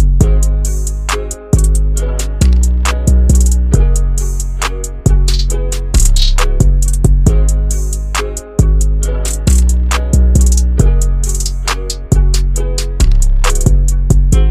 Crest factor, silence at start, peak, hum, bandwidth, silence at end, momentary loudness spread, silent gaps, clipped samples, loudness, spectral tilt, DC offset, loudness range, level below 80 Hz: 10 dB; 0 s; 0 dBFS; none; 15 kHz; 0 s; 7 LU; none; under 0.1%; -13 LUFS; -5 dB/octave; under 0.1%; 1 LU; -10 dBFS